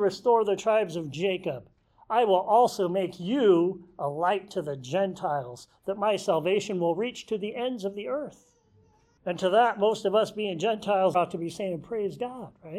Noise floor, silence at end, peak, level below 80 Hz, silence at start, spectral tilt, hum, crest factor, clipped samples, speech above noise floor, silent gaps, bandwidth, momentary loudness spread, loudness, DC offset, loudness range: -62 dBFS; 0 s; -10 dBFS; -68 dBFS; 0 s; -5.5 dB/octave; none; 16 dB; under 0.1%; 36 dB; none; 14 kHz; 12 LU; -27 LUFS; under 0.1%; 4 LU